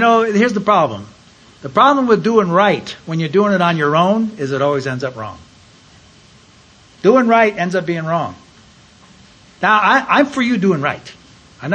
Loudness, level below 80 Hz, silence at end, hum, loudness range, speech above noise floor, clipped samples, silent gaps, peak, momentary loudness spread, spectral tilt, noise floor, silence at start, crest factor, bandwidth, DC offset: -15 LUFS; -56 dBFS; 0 s; none; 4 LU; 32 dB; under 0.1%; none; 0 dBFS; 12 LU; -6 dB/octave; -46 dBFS; 0 s; 16 dB; 9.4 kHz; under 0.1%